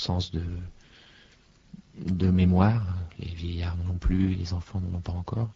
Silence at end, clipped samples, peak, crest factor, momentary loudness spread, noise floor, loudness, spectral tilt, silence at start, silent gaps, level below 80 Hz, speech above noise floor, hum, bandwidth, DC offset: 0.05 s; under 0.1%; -6 dBFS; 22 dB; 15 LU; -58 dBFS; -28 LUFS; -8 dB/octave; 0 s; none; -38 dBFS; 31 dB; none; 7.4 kHz; under 0.1%